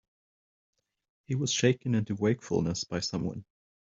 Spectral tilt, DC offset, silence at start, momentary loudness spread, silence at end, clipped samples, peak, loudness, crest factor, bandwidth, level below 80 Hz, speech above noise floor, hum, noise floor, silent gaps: -5 dB/octave; under 0.1%; 1.3 s; 9 LU; 0.5 s; under 0.1%; -10 dBFS; -30 LUFS; 22 dB; 8 kHz; -62 dBFS; over 61 dB; none; under -90 dBFS; none